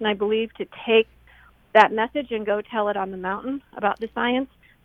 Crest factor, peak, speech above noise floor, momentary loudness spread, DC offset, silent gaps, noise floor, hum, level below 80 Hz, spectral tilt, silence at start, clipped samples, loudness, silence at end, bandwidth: 22 dB; -2 dBFS; 31 dB; 13 LU; under 0.1%; none; -53 dBFS; none; -58 dBFS; -6 dB/octave; 0 s; under 0.1%; -23 LUFS; 0.4 s; 7.6 kHz